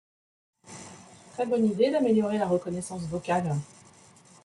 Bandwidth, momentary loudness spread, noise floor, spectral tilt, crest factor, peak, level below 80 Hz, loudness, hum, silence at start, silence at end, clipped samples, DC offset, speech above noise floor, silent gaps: 11.5 kHz; 21 LU; -55 dBFS; -6.5 dB/octave; 18 dB; -12 dBFS; -64 dBFS; -27 LUFS; none; 0.65 s; 0.8 s; under 0.1%; under 0.1%; 29 dB; none